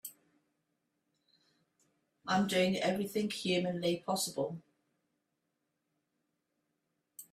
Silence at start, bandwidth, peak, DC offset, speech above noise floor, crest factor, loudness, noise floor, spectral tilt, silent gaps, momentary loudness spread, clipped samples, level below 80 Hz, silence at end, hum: 0.05 s; 16 kHz; -18 dBFS; under 0.1%; 51 dB; 20 dB; -33 LUFS; -84 dBFS; -4.5 dB/octave; none; 18 LU; under 0.1%; -76 dBFS; 0.1 s; none